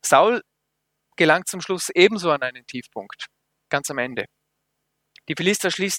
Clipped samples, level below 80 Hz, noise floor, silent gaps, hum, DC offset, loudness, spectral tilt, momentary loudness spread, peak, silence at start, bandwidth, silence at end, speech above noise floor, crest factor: under 0.1%; -68 dBFS; -77 dBFS; none; none; under 0.1%; -21 LUFS; -3 dB/octave; 19 LU; 0 dBFS; 0.05 s; 17.5 kHz; 0 s; 56 dB; 22 dB